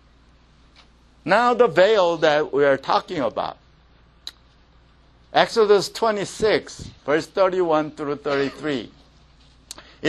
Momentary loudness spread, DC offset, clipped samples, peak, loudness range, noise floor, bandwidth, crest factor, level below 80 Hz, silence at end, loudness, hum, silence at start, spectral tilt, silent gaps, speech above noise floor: 22 LU; under 0.1%; under 0.1%; 0 dBFS; 5 LU; -54 dBFS; 13 kHz; 22 dB; -54 dBFS; 0 s; -20 LUFS; none; 1.25 s; -4.5 dB/octave; none; 34 dB